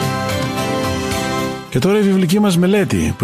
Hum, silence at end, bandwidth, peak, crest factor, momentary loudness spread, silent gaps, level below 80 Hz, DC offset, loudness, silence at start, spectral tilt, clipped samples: none; 0 s; 15.5 kHz; -4 dBFS; 12 dB; 6 LU; none; -38 dBFS; under 0.1%; -16 LUFS; 0 s; -5.5 dB/octave; under 0.1%